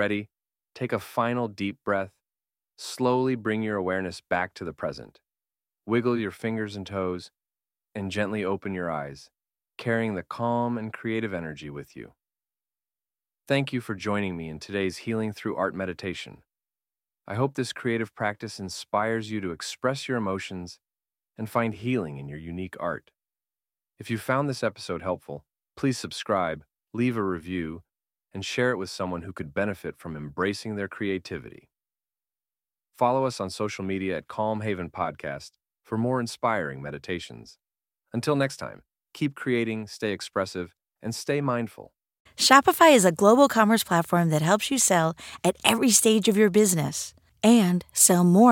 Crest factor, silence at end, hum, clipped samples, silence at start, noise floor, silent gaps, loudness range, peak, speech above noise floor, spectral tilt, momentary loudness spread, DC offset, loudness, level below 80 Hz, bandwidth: 26 dB; 0 s; none; under 0.1%; 0 s; under -90 dBFS; 42.20-42.25 s; 11 LU; -2 dBFS; over 64 dB; -4 dB/octave; 18 LU; under 0.1%; -26 LUFS; -62 dBFS; 17 kHz